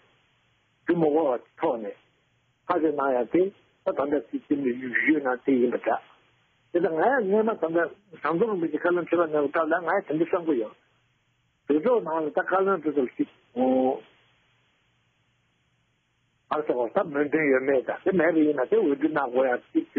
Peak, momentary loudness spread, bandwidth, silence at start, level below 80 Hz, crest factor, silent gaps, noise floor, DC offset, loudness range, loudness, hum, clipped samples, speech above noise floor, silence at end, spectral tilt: -8 dBFS; 8 LU; 4.4 kHz; 0.85 s; -72 dBFS; 18 dB; none; -70 dBFS; under 0.1%; 5 LU; -25 LUFS; none; under 0.1%; 46 dB; 0 s; -5.5 dB/octave